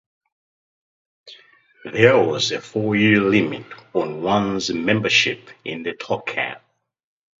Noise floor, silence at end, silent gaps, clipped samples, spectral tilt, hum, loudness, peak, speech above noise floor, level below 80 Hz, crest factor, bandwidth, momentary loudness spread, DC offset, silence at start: -50 dBFS; 0.85 s; none; under 0.1%; -4.5 dB/octave; none; -19 LUFS; 0 dBFS; 30 dB; -58 dBFS; 22 dB; 7.8 kHz; 14 LU; under 0.1%; 1.25 s